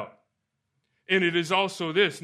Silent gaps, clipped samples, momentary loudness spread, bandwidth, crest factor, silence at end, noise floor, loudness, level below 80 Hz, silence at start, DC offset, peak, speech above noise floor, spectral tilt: none; under 0.1%; 3 LU; 13.5 kHz; 20 dB; 0.05 s; -80 dBFS; -24 LUFS; -76 dBFS; 0 s; under 0.1%; -8 dBFS; 55 dB; -4.5 dB/octave